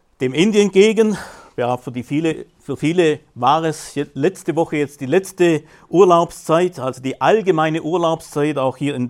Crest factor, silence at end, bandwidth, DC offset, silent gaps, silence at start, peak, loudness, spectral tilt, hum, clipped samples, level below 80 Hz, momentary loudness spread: 16 dB; 0 s; 14.5 kHz; under 0.1%; none; 0.2 s; 0 dBFS; -18 LUFS; -5.5 dB/octave; none; under 0.1%; -56 dBFS; 11 LU